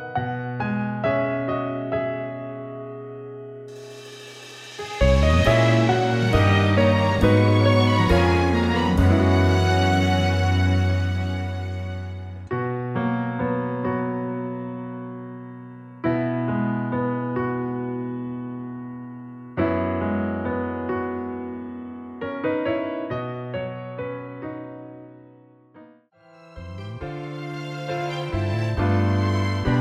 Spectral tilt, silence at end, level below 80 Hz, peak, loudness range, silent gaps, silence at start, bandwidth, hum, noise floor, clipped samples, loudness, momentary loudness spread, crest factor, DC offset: -7 dB/octave; 0 s; -36 dBFS; -4 dBFS; 14 LU; none; 0 s; 10.5 kHz; none; -53 dBFS; under 0.1%; -23 LUFS; 19 LU; 18 dB; under 0.1%